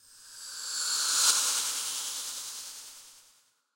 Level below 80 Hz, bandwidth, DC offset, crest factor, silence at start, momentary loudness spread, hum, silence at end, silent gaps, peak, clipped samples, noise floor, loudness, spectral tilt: -80 dBFS; 16.5 kHz; under 0.1%; 24 dB; 0.1 s; 21 LU; none; 0.55 s; none; -8 dBFS; under 0.1%; -65 dBFS; -27 LUFS; 4 dB/octave